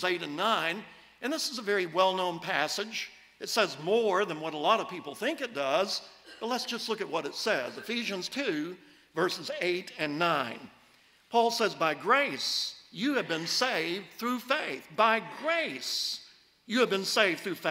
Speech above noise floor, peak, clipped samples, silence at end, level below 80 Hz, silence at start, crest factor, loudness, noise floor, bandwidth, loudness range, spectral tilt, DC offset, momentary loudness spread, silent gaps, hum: 32 dB; -10 dBFS; under 0.1%; 0 s; -78 dBFS; 0 s; 22 dB; -30 LUFS; -62 dBFS; 16 kHz; 3 LU; -3 dB/octave; under 0.1%; 10 LU; none; none